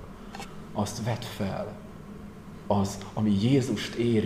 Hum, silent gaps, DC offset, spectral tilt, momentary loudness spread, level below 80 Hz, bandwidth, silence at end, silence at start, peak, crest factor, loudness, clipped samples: none; none; 0.1%; -6.5 dB/octave; 19 LU; -52 dBFS; 15.5 kHz; 0 s; 0 s; -12 dBFS; 18 dB; -29 LUFS; under 0.1%